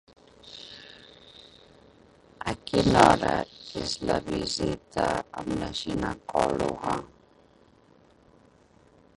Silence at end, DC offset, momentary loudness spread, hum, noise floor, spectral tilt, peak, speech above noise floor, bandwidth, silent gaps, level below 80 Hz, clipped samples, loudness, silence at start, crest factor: 2.1 s; under 0.1%; 25 LU; none; -59 dBFS; -5 dB/octave; -2 dBFS; 33 dB; 11.5 kHz; none; -48 dBFS; under 0.1%; -27 LUFS; 0.45 s; 28 dB